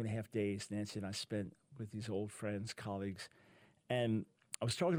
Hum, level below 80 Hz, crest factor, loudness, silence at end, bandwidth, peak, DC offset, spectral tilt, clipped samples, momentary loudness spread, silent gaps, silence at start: none; -72 dBFS; 24 dB; -42 LUFS; 0 s; 18 kHz; -16 dBFS; under 0.1%; -5.5 dB/octave; under 0.1%; 12 LU; none; 0 s